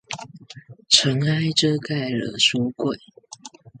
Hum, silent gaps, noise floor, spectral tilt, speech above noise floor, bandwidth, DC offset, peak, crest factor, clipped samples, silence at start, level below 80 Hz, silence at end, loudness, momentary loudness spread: none; none; -44 dBFS; -3.5 dB/octave; 23 dB; 9.6 kHz; under 0.1%; 0 dBFS; 24 dB; under 0.1%; 0.1 s; -62 dBFS; 0.3 s; -20 LUFS; 24 LU